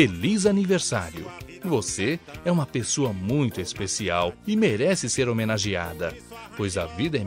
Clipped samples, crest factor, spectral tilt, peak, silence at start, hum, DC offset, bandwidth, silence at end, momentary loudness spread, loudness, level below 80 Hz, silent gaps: under 0.1%; 20 dB; -4.5 dB/octave; -6 dBFS; 0 s; none; under 0.1%; 16 kHz; 0 s; 11 LU; -25 LUFS; -50 dBFS; none